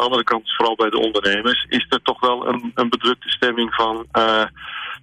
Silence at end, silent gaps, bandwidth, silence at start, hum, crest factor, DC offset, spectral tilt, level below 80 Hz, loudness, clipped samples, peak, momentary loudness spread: 0.05 s; none; 11 kHz; 0 s; none; 14 dB; under 0.1%; -4 dB/octave; -54 dBFS; -19 LUFS; under 0.1%; -6 dBFS; 4 LU